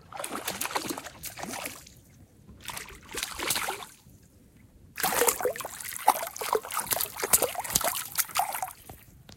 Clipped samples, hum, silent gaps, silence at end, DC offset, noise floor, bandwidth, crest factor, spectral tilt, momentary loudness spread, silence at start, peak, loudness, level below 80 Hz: under 0.1%; none; none; 0 s; under 0.1%; -56 dBFS; 17 kHz; 32 dB; -1 dB/octave; 16 LU; 0.05 s; 0 dBFS; -29 LUFS; -58 dBFS